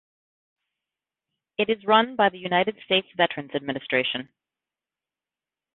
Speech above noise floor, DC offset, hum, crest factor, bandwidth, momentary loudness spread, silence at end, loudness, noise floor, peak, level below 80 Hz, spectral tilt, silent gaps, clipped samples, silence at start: over 66 dB; under 0.1%; none; 22 dB; 4.3 kHz; 10 LU; 1.5 s; -24 LUFS; under -90 dBFS; -4 dBFS; -70 dBFS; -8.5 dB/octave; none; under 0.1%; 1.6 s